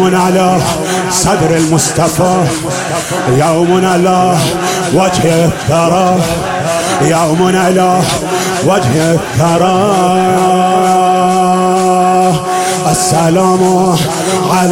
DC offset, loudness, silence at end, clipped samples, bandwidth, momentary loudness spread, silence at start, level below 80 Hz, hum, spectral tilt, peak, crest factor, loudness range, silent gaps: under 0.1%; -10 LUFS; 0 s; under 0.1%; 17 kHz; 4 LU; 0 s; -38 dBFS; none; -5 dB/octave; 0 dBFS; 10 dB; 1 LU; none